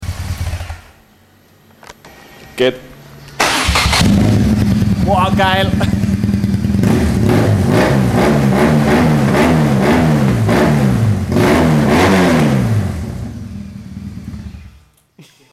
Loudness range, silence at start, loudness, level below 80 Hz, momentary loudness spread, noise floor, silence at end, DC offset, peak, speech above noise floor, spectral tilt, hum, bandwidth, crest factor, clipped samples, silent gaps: 7 LU; 0 s; -13 LUFS; -28 dBFS; 18 LU; -48 dBFS; 0.3 s; under 0.1%; 0 dBFS; 35 dB; -6 dB/octave; none; 15.5 kHz; 14 dB; under 0.1%; none